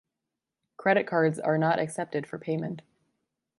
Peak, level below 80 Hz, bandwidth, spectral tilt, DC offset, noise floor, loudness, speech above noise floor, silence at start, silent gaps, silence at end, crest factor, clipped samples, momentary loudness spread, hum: -10 dBFS; -74 dBFS; 11.5 kHz; -6.5 dB/octave; under 0.1%; -87 dBFS; -28 LUFS; 60 dB; 0.8 s; none; 0.8 s; 20 dB; under 0.1%; 9 LU; none